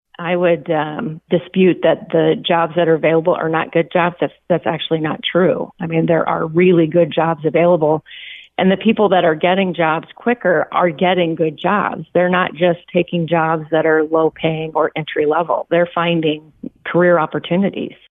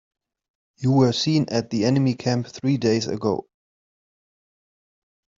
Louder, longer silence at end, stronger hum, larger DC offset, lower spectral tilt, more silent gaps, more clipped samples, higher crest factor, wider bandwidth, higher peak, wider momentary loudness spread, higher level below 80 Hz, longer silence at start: first, -16 LUFS vs -22 LUFS; second, 0.15 s vs 1.95 s; neither; neither; first, -10 dB/octave vs -6.5 dB/octave; neither; neither; second, 12 dB vs 18 dB; second, 3.9 kHz vs 7.6 kHz; about the same, -4 dBFS vs -4 dBFS; about the same, 7 LU vs 7 LU; about the same, -60 dBFS vs -60 dBFS; second, 0.2 s vs 0.8 s